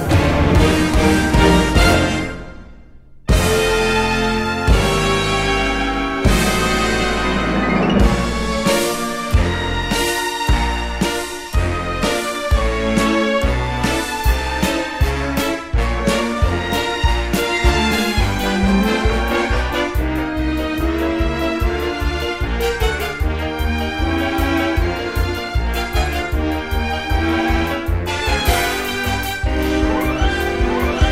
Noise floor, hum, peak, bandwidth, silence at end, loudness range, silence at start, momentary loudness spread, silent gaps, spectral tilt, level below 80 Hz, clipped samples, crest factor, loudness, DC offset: -40 dBFS; none; 0 dBFS; 16 kHz; 0 s; 3 LU; 0 s; 6 LU; none; -5 dB/octave; -22 dBFS; under 0.1%; 16 dB; -18 LUFS; 0.3%